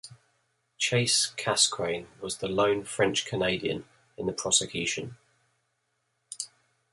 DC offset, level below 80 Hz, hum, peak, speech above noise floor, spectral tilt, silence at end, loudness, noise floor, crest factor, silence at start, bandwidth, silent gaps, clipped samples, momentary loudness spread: under 0.1%; -62 dBFS; none; -6 dBFS; 49 dB; -2.5 dB/octave; 0.45 s; -27 LUFS; -77 dBFS; 24 dB; 0.05 s; 11.5 kHz; none; under 0.1%; 15 LU